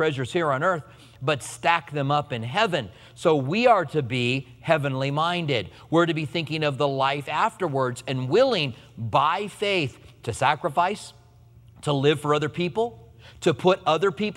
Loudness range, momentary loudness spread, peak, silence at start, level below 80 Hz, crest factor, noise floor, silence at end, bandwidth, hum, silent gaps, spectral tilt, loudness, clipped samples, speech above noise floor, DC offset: 2 LU; 8 LU; -4 dBFS; 0 s; -60 dBFS; 20 dB; -52 dBFS; 0 s; 13.5 kHz; none; none; -5.5 dB/octave; -24 LUFS; under 0.1%; 28 dB; under 0.1%